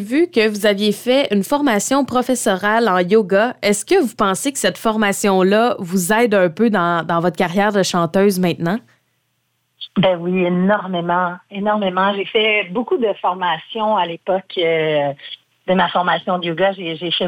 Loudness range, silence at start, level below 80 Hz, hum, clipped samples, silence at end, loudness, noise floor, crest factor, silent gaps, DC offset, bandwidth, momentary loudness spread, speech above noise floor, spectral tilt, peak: 3 LU; 0 s; -56 dBFS; none; under 0.1%; 0 s; -17 LUFS; -67 dBFS; 14 dB; none; under 0.1%; 19 kHz; 6 LU; 51 dB; -4.5 dB/octave; -2 dBFS